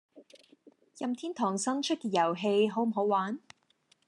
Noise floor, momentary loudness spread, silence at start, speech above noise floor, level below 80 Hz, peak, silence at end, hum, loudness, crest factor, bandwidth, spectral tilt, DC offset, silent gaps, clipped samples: -70 dBFS; 9 LU; 0.15 s; 40 dB; -88 dBFS; -16 dBFS; 0.7 s; none; -30 LUFS; 16 dB; 11.5 kHz; -4.5 dB/octave; under 0.1%; none; under 0.1%